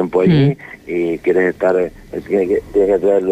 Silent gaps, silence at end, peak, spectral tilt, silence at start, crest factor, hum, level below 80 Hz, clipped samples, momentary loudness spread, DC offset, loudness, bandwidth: none; 0 s; -4 dBFS; -8.5 dB/octave; 0 s; 12 dB; none; -44 dBFS; under 0.1%; 10 LU; under 0.1%; -16 LUFS; 9.2 kHz